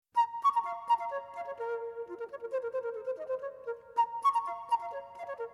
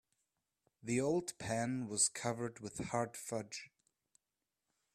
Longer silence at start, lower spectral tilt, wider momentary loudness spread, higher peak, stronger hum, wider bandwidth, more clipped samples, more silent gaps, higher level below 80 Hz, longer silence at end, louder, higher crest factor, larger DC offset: second, 0.15 s vs 0.85 s; about the same, -3 dB/octave vs -4 dB/octave; about the same, 13 LU vs 12 LU; about the same, -18 dBFS vs -20 dBFS; neither; second, 12.5 kHz vs 15.5 kHz; neither; neither; second, -82 dBFS vs -72 dBFS; second, 0 s vs 1.3 s; first, -34 LUFS vs -38 LUFS; second, 16 dB vs 22 dB; neither